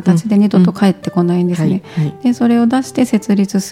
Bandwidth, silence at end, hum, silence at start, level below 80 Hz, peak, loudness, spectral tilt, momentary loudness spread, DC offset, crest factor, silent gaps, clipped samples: 15 kHz; 0 s; none; 0 s; -56 dBFS; 0 dBFS; -14 LUFS; -7 dB/octave; 5 LU; under 0.1%; 12 dB; none; under 0.1%